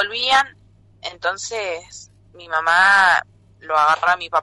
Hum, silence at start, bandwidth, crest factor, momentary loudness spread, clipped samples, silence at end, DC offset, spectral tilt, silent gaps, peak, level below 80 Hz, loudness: none; 0 s; 11.5 kHz; 14 dB; 15 LU; under 0.1%; 0 s; under 0.1%; -0.5 dB/octave; none; -6 dBFS; -58 dBFS; -17 LUFS